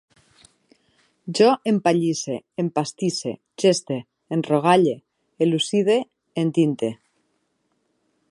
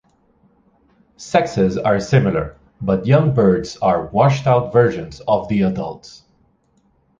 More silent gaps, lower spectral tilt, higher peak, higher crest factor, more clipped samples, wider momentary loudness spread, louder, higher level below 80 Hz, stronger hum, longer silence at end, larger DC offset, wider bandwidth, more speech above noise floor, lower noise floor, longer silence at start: neither; second, -5.5 dB/octave vs -7.5 dB/octave; about the same, -4 dBFS vs -2 dBFS; about the same, 20 dB vs 16 dB; neither; about the same, 12 LU vs 12 LU; second, -22 LUFS vs -17 LUFS; second, -72 dBFS vs -44 dBFS; neither; first, 1.35 s vs 1.05 s; neither; first, 11.5 kHz vs 7.6 kHz; first, 50 dB vs 44 dB; first, -71 dBFS vs -60 dBFS; about the same, 1.25 s vs 1.2 s